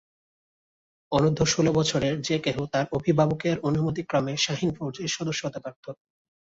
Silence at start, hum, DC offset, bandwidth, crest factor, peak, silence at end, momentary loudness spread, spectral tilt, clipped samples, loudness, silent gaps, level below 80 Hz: 1.1 s; none; under 0.1%; 8 kHz; 18 dB; -8 dBFS; 0.65 s; 9 LU; -5 dB/octave; under 0.1%; -25 LUFS; 5.76-5.83 s; -54 dBFS